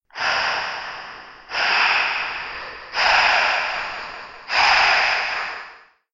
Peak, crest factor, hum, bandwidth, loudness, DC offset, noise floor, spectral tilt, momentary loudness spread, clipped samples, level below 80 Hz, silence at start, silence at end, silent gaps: -4 dBFS; 18 dB; none; 7.8 kHz; -19 LUFS; under 0.1%; -45 dBFS; 0 dB/octave; 18 LU; under 0.1%; -52 dBFS; 0.15 s; 0.35 s; none